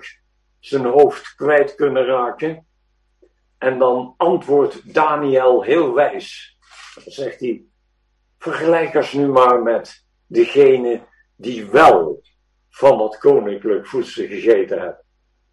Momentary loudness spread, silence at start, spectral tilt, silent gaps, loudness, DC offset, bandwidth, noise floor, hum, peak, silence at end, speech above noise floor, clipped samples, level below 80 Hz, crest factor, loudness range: 16 LU; 0.05 s; -6 dB/octave; none; -16 LUFS; under 0.1%; 11 kHz; -64 dBFS; none; 0 dBFS; 0.6 s; 49 dB; under 0.1%; -58 dBFS; 18 dB; 5 LU